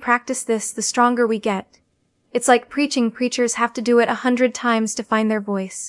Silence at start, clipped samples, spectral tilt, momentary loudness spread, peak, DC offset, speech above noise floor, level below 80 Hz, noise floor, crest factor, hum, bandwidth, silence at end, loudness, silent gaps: 0 s; under 0.1%; -3.5 dB/octave; 6 LU; -2 dBFS; under 0.1%; 47 dB; -66 dBFS; -66 dBFS; 18 dB; none; 12 kHz; 0 s; -20 LUFS; none